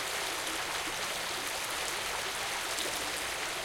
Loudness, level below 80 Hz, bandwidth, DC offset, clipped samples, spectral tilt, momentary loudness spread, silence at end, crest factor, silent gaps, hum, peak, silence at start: -33 LUFS; -60 dBFS; 17 kHz; under 0.1%; under 0.1%; 0 dB/octave; 1 LU; 0 s; 20 dB; none; none; -14 dBFS; 0 s